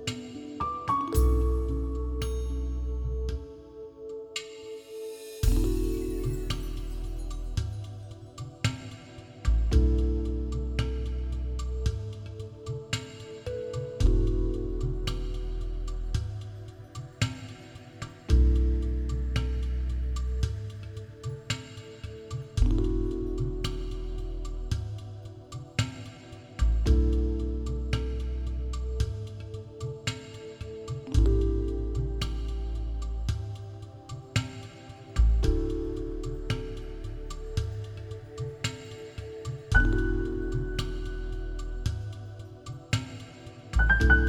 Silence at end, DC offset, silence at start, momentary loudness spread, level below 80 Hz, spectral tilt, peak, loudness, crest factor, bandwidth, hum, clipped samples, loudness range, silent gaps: 0 s; under 0.1%; 0 s; 17 LU; -30 dBFS; -6 dB/octave; -8 dBFS; -32 LUFS; 22 dB; 15 kHz; none; under 0.1%; 5 LU; none